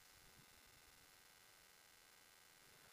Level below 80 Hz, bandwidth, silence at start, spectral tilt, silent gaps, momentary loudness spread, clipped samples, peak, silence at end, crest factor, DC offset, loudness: -84 dBFS; 15.5 kHz; 0 s; -1 dB/octave; none; 1 LU; under 0.1%; -52 dBFS; 0 s; 16 dB; under 0.1%; -66 LUFS